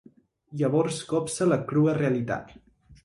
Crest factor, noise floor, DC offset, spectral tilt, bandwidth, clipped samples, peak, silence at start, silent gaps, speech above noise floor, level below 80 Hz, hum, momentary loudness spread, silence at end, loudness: 16 dB; -54 dBFS; under 0.1%; -6.5 dB/octave; 11.5 kHz; under 0.1%; -12 dBFS; 0.5 s; none; 28 dB; -60 dBFS; none; 9 LU; 0.1 s; -26 LUFS